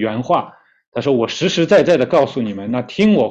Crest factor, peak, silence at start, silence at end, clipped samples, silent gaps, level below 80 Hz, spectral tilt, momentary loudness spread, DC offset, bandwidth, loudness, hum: 12 dB; -4 dBFS; 0 s; 0 s; under 0.1%; 0.87-0.92 s; -54 dBFS; -6 dB/octave; 10 LU; under 0.1%; 8.2 kHz; -16 LUFS; none